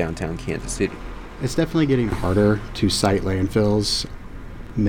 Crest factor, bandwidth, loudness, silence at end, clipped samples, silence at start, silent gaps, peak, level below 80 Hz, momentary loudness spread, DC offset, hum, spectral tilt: 16 dB; 17.5 kHz; -22 LUFS; 0 s; under 0.1%; 0 s; none; -6 dBFS; -34 dBFS; 16 LU; under 0.1%; none; -5.5 dB/octave